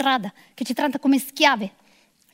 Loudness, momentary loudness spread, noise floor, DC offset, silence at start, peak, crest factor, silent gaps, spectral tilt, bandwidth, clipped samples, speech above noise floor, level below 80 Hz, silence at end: -21 LUFS; 15 LU; -59 dBFS; under 0.1%; 0 s; 0 dBFS; 22 dB; none; -3.5 dB/octave; 16 kHz; under 0.1%; 37 dB; -76 dBFS; 0.65 s